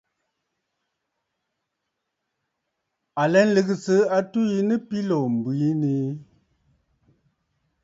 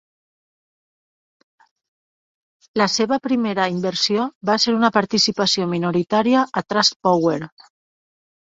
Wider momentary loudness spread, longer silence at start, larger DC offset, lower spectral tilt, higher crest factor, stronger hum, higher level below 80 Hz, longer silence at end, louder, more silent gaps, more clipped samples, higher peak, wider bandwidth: first, 8 LU vs 5 LU; first, 3.15 s vs 2.75 s; neither; first, -7 dB/octave vs -4 dB/octave; about the same, 20 dB vs 20 dB; neither; second, -70 dBFS vs -62 dBFS; first, 1.6 s vs 1 s; second, -22 LUFS vs -19 LUFS; second, none vs 4.35-4.41 s, 6.96-7.00 s; neither; second, -6 dBFS vs -2 dBFS; about the same, 7.8 kHz vs 8 kHz